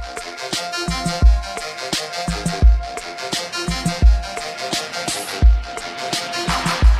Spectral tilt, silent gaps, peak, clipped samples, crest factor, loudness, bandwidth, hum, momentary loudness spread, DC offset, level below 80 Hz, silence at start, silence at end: -4 dB/octave; none; -2 dBFS; under 0.1%; 16 dB; -21 LUFS; 13.5 kHz; none; 10 LU; under 0.1%; -20 dBFS; 0 s; 0 s